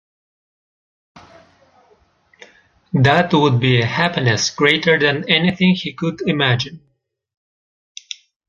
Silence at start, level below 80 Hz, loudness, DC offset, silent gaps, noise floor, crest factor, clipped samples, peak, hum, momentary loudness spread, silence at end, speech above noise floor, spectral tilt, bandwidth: 1.15 s; -54 dBFS; -16 LUFS; under 0.1%; none; -56 dBFS; 18 dB; under 0.1%; 0 dBFS; none; 10 LU; 1.7 s; 40 dB; -5 dB/octave; 7.4 kHz